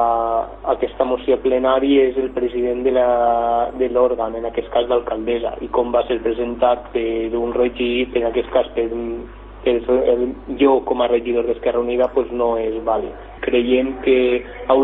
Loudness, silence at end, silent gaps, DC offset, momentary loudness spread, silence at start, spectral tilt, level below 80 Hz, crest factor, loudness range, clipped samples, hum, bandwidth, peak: -19 LUFS; 0 s; none; under 0.1%; 7 LU; 0 s; -9 dB/octave; -40 dBFS; 16 dB; 3 LU; under 0.1%; none; 4 kHz; -2 dBFS